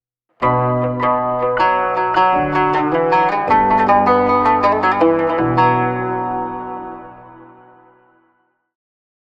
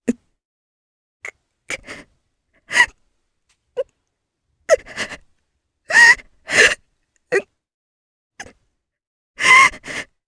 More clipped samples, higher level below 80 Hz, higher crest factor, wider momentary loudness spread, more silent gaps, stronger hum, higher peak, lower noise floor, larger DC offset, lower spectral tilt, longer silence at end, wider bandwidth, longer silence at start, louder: neither; first, -46 dBFS vs -54 dBFS; about the same, 16 dB vs 20 dB; second, 10 LU vs 26 LU; second, none vs 0.45-1.20 s, 7.74-8.30 s, 9.07-9.34 s; neither; about the same, -2 dBFS vs 0 dBFS; second, -63 dBFS vs -74 dBFS; neither; first, -8 dB/octave vs -1 dB/octave; first, 1.9 s vs 0.25 s; second, 7.6 kHz vs 11 kHz; first, 0.4 s vs 0.05 s; about the same, -15 LUFS vs -14 LUFS